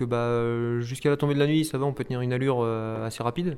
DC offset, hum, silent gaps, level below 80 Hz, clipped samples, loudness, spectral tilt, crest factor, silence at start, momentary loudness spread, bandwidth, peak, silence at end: under 0.1%; none; none; -56 dBFS; under 0.1%; -26 LUFS; -7 dB/octave; 16 dB; 0 s; 6 LU; 15.5 kHz; -10 dBFS; 0 s